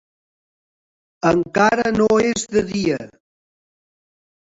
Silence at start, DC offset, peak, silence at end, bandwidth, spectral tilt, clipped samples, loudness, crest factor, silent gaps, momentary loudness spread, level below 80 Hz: 1.25 s; under 0.1%; -2 dBFS; 1.45 s; 8 kHz; -5 dB/octave; under 0.1%; -18 LUFS; 18 dB; none; 6 LU; -50 dBFS